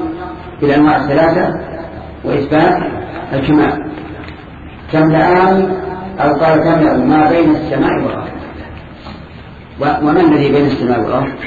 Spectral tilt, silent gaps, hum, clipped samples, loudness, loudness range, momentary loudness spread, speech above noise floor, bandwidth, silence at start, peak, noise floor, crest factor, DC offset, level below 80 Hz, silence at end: -9 dB/octave; none; none; under 0.1%; -12 LUFS; 4 LU; 21 LU; 21 dB; 7 kHz; 0 s; 0 dBFS; -33 dBFS; 12 dB; under 0.1%; -36 dBFS; 0 s